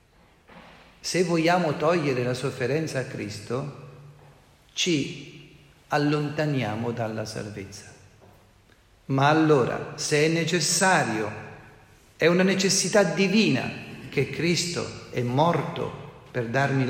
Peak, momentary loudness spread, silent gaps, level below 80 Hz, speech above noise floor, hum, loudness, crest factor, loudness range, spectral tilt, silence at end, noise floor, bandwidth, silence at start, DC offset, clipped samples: -6 dBFS; 15 LU; none; -60 dBFS; 33 dB; none; -24 LUFS; 20 dB; 7 LU; -4.5 dB/octave; 0 s; -57 dBFS; 16 kHz; 0.5 s; under 0.1%; under 0.1%